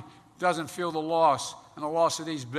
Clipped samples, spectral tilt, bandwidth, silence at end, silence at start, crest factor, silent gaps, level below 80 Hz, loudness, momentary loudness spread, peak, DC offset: under 0.1%; -4 dB/octave; 13.5 kHz; 0 s; 0 s; 18 dB; none; -72 dBFS; -28 LUFS; 9 LU; -10 dBFS; under 0.1%